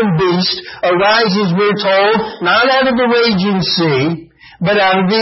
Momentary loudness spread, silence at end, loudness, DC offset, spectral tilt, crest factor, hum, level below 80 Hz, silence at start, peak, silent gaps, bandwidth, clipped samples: 5 LU; 0 s; -12 LUFS; under 0.1%; -6.5 dB/octave; 12 dB; none; -48 dBFS; 0 s; -2 dBFS; none; 6 kHz; under 0.1%